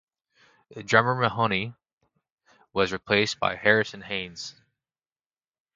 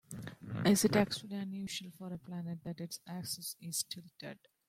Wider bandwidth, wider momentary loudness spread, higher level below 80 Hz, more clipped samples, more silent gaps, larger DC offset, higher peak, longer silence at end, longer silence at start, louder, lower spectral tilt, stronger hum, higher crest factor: second, 9.2 kHz vs 16.5 kHz; about the same, 17 LU vs 18 LU; first, -60 dBFS vs -70 dBFS; neither; first, 1.93-1.97 s, 2.31-2.38 s vs none; neither; first, -4 dBFS vs -14 dBFS; first, 1.25 s vs 0.35 s; first, 0.7 s vs 0.1 s; first, -24 LUFS vs -36 LUFS; about the same, -4.5 dB/octave vs -4.5 dB/octave; neither; about the same, 26 dB vs 22 dB